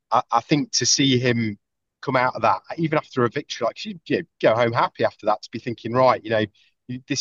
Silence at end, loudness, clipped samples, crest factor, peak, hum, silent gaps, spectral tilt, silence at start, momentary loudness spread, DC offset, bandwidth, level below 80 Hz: 0 s; -22 LUFS; under 0.1%; 18 dB; -4 dBFS; none; none; -4 dB/octave; 0.1 s; 12 LU; under 0.1%; 8.2 kHz; -66 dBFS